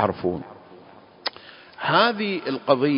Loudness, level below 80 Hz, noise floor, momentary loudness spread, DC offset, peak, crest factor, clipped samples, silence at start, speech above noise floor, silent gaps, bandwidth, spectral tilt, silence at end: -24 LUFS; -58 dBFS; -48 dBFS; 22 LU; under 0.1%; -2 dBFS; 22 dB; under 0.1%; 0 s; 26 dB; none; 5.6 kHz; -9.5 dB/octave; 0 s